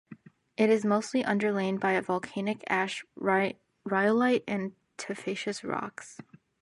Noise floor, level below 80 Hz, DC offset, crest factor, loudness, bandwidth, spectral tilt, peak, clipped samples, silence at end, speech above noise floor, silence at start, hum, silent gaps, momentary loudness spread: -52 dBFS; -74 dBFS; under 0.1%; 18 dB; -29 LUFS; 11.5 kHz; -5.5 dB/octave; -12 dBFS; under 0.1%; 0.4 s; 24 dB; 0.1 s; none; none; 14 LU